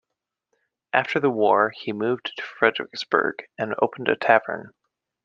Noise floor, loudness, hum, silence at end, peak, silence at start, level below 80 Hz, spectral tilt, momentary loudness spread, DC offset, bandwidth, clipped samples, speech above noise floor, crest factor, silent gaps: -83 dBFS; -23 LUFS; none; 0.55 s; -2 dBFS; 0.95 s; -72 dBFS; -5.5 dB/octave; 11 LU; under 0.1%; 7.4 kHz; under 0.1%; 61 dB; 22 dB; none